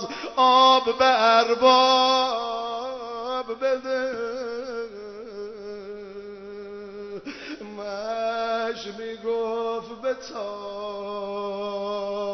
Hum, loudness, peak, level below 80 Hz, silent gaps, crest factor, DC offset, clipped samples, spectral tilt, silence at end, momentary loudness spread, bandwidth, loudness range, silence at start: none; -23 LUFS; -6 dBFS; -64 dBFS; none; 18 dB; under 0.1%; under 0.1%; -3 dB/octave; 0 s; 20 LU; 6.4 kHz; 16 LU; 0 s